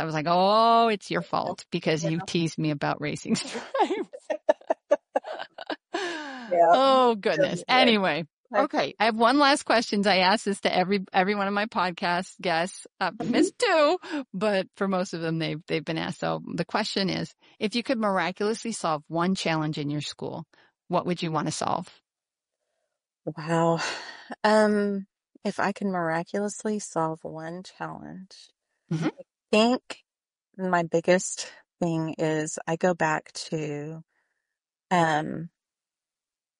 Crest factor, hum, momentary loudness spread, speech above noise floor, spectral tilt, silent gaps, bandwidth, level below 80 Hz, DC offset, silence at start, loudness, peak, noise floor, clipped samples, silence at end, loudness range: 20 dB; none; 15 LU; over 64 dB; -4.5 dB/octave; 8.33-8.44 s; 10.5 kHz; -70 dBFS; under 0.1%; 0 s; -26 LUFS; -6 dBFS; under -90 dBFS; under 0.1%; 1.1 s; 8 LU